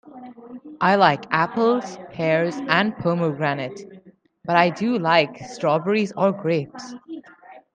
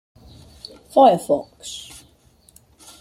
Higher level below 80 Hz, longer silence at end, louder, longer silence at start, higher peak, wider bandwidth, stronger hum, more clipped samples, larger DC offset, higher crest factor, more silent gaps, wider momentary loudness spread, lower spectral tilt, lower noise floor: second, -64 dBFS vs -56 dBFS; second, 0.15 s vs 1.2 s; second, -21 LUFS vs -17 LUFS; second, 0.05 s vs 0.95 s; about the same, -2 dBFS vs -2 dBFS; second, 9.2 kHz vs 15.5 kHz; neither; neither; neither; about the same, 20 dB vs 20 dB; neither; second, 21 LU vs 26 LU; about the same, -6 dB/octave vs -5 dB/octave; second, -50 dBFS vs -55 dBFS